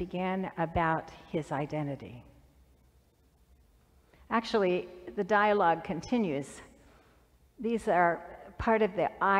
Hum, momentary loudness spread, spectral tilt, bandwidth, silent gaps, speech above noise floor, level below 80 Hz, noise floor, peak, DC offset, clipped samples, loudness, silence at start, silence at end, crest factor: none; 12 LU; -6.5 dB/octave; 12.5 kHz; none; 36 dB; -56 dBFS; -65 dBFS; -12 dBFS; under 0.1%; under 0.1%; -30 LUFS; 0 s; 0 s; 20 dB